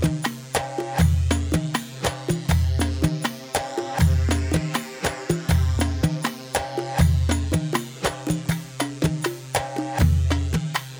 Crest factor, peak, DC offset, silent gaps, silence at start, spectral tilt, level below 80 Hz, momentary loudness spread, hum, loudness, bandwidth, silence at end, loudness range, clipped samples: 16 dB; -6 dBFS; under 0.1%; none; 0 s; -5.5 dB/octave; -30 dBFS; 7 LU; none; -24 LUFS; over 20 kHz; 0 s; 1 LU; under 0.1%